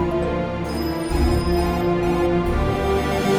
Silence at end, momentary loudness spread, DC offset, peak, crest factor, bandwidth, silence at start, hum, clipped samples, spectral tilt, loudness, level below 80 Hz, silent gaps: 0 s; 5 LU; under 0.1%; -8 dBFS; 12 dB; 16 kHz; 0 s; none; under 0.1%; -6.5 dB/octave; -21 LUFS; -28 dBFS; none